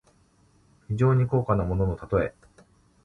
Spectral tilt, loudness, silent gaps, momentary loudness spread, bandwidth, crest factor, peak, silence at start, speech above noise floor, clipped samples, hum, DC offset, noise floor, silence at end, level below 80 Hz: -10 dB/octave; -25 LUFS; none; 8 LU; 7.2 kHz; 16 dB; -10 dBFS; 0.9 s; 38 dB; under 0.1%; none; under 0.1%; -61 dBFS; 0.75 s; -42 dBFS